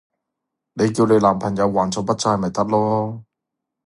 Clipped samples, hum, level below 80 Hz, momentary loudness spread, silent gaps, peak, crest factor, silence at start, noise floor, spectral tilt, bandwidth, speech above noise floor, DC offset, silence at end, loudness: under 0.1%; none; -52 dBFS; 9 LU; none; -2 dBFS; 18 dB; 0.75 s; -82 dBFS; -6 dB/octave; 11.5 kHz; 63 dB; under 0.1%; 0.65 s; -19 LUFS